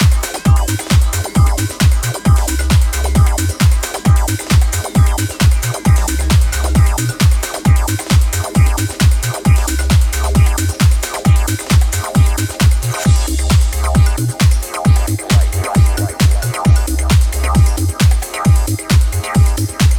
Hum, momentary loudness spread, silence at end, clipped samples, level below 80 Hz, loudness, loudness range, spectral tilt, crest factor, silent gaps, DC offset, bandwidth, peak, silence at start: none; 2 LU; 0 s; under 0.1%; -16 dBFS; -14 LUFS; 0 LU; -5 dB/octave; 10 dB; none; under 0.1%; 18.5 kHz; -2 dBFS; 0 s